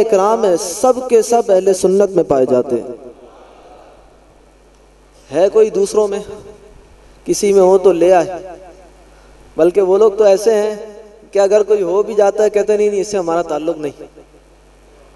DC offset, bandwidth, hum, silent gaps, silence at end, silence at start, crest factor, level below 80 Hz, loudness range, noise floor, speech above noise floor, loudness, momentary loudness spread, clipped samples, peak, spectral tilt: under 0.1%; 12.5 kHz; none; none; 0.95 s; 0 s; 14 dB; -48 dBFS; 5 LU; -46 dBFS; 34 dB; -13 LUFS; 15 LU; under 0.1%; 0 dBFS; -5 dB/octave